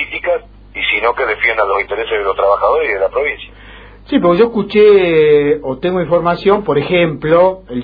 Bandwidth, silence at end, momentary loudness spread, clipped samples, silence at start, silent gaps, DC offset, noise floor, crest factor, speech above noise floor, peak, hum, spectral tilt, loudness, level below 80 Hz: 5 kHz; 0 s; 8 LU; under 0.1%; 0 s; none; under 0.1%; -36 dBFS; 12 dB; 24 dB; 0 dBFS; 50 Hz at -40 dBFS; -9 dB/octave; -13 LUFS; -40 dBFS